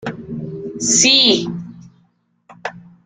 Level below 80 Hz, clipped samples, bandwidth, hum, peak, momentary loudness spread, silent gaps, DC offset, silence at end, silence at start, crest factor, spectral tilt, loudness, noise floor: -56 dBFS; under 0.1%; 10.5 kHz; none; 0 dBFS; 22 LU; none; under 0.1%; 0.25 s; 0 s; 18 dB; -1.5 dB/octave; -12 LUFS; -60 dBFS